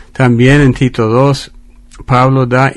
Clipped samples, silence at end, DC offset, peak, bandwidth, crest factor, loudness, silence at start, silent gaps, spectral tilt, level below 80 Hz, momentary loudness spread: 0.4%; 0 s; under 0.1%; 0 dBFS; 11.5 kHz; 10 dB; -10 LUFS; 0.2 s; none; -7 dB/octave; -30 dBFS; 6 LU